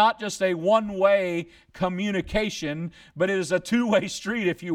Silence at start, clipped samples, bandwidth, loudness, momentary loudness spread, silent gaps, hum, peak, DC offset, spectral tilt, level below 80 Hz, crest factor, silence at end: 0 s; under 0.1%; 15 kHz; -25 LUFS; 10 LU; none; none; -6 dBFS; under 0.1%; -5 dB/octave; -50 dBFS; 18 dB; 0 s